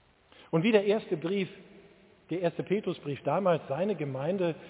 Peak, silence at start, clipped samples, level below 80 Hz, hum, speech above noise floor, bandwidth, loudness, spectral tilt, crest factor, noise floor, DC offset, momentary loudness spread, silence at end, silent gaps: -10 dBFS; 0.4 s; under 0.1%; -72 dBFS; none; 29 dB; 4 kHz; -30 LUFS; -5.5 dB/octave; 22 dB; -58 dBFS; under 0.1%; 9 LU; 0 s; none